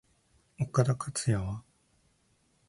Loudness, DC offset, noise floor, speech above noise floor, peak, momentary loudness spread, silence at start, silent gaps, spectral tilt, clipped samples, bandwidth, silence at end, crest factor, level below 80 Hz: -31 LUFS; under 0.1%; -70 dBFS; 41 dB; -12 dBFS; 11 LU; 0.6 s; none; -6 dB/octave; under 0.1%; 11.5 kHz; 1.1 s; 22 dB; -54 dBFS